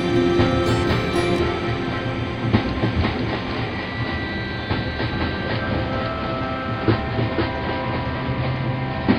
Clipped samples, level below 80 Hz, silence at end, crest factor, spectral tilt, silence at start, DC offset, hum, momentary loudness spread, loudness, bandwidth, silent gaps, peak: under 0.1%; -34 dBFS; 0 s; 20 dB; -7 dB/octave; 0 s; under 0.1%; none; 6 LU; -23 LUFS; 11 kHz; none; -2 dBFS